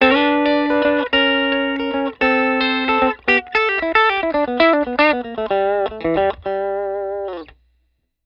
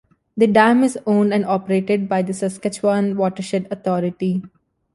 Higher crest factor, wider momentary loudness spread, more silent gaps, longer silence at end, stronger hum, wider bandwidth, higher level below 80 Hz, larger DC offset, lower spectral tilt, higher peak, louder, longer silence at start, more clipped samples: about the same, 18 dB vs 16 dB; about the same, 8 LU vs 10 LU; neither; first, 0.8 s vs 0.5 s; neither; second, 7 kHz vs 11.5 kHz; first, -48 dBFS vs -62 dBFS; neither; about the same, -6 dB/octave vs -6.5 dB/octave; about the same, 0 dBFS vs -2 dBFS; about the same, -17 LUFS vs -19 LUFS; second, 0 s vs 0.35 s; neither